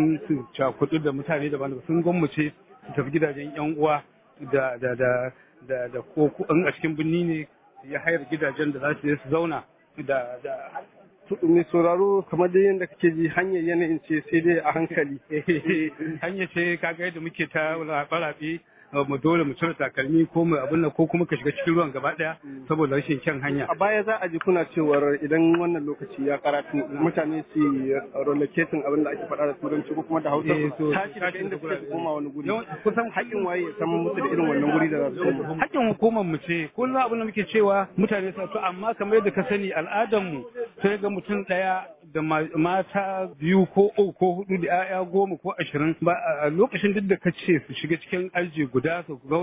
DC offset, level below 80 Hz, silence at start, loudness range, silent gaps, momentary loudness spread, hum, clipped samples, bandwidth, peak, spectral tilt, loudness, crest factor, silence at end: under 0.1%; -62 dBFS; 0 s; 3 LU; none; 8 LU; none; under 0.1%; 3.9 kHz; -6 dBFS; -11 dB/octave; -25 LUFS; 18 dB; 0 s